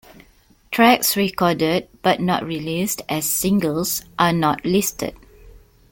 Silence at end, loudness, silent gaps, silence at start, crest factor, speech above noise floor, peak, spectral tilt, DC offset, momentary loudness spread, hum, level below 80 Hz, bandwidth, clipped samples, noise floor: 0.35 s; -19 LUFS; none; 0.7 s; 18 dB; 34 dB; -2 dBFS; -4 dB/octave; under 0.1%; 8 LU; none; -50 dBFS; 17 kHz; under 0.1%; -54 dBFS